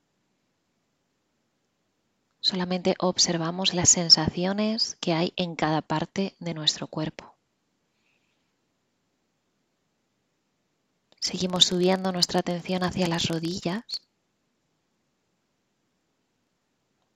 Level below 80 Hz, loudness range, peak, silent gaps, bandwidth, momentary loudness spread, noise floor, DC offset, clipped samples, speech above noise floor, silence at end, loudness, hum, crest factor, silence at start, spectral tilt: -60 dBFS; 14 LU; -2 dBFS; none; 15 kHz; 12 LU; -75 dBFS; under 0.1%; under 0.1%; 49 dB; 3.2 s; -24 LUFS; none; 26 dB; 2.45 s; -3 dB/octave